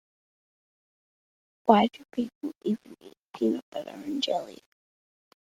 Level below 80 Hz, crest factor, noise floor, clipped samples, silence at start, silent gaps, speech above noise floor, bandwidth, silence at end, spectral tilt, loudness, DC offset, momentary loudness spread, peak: -72 dBFS; 26 dB; under -90 dBFS; under 0.1%; 1.65 s; 2.35-2.41 s, 2.55-2.61 s, 3.17-3.29 s, 3.62-3.72 s; over 62 dB; 14 kHz; 0.9 s; -6 dB/octave; -28 LUFS; under 0.1%; 15 LU; -4 dBFS